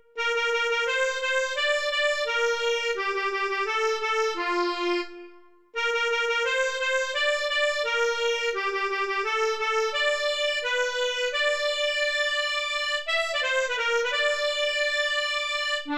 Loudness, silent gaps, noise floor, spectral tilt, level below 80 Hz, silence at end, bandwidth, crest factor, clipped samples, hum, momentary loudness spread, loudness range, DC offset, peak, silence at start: -25 LUFS; none; -51 dBFS; 0.5 dB/octave; -62 dBFS; 0 s; 14.5 kHz; 14 dB; under 0.1%; none; 3 LU; 2 LU; under 0.1%; -12 dBFS; 0.15 s